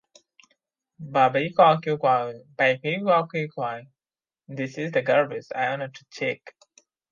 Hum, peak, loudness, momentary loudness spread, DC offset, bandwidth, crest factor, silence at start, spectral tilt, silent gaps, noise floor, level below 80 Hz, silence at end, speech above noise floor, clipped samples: none; -4 dBFS; -24 LUFS; 15 LU; under 0.1%; 7.4 kHz; 22 dB; 1 s; -6 dB/octave; none; under -90 dBFS; -74 dBFS; 0.65 s; over 66 dB; under 0.1%